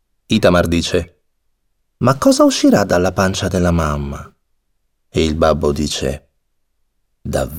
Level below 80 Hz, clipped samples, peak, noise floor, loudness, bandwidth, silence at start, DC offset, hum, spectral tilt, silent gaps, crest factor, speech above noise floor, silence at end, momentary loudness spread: -36 dBFS; under 0.1%; 0 dBFS; -65 dBFS; -15 LUFS; 17.5 kHz; 0.3 s; 0.4%; none; -5.5 dB/octave; none; 16 dB; 51 dB; 0 s; 12 LU